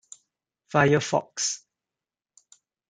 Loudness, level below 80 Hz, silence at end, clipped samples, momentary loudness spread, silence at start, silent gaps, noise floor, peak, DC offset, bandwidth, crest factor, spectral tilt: -24 LUFS; -64 dBFS; 1.35 s; under 0.1%; 7 LU; 0.75 s; none; under -90 dBFS; -6 dBFS; under 0.1%; 9.6 kHz; 22 dB; -4 dB/octave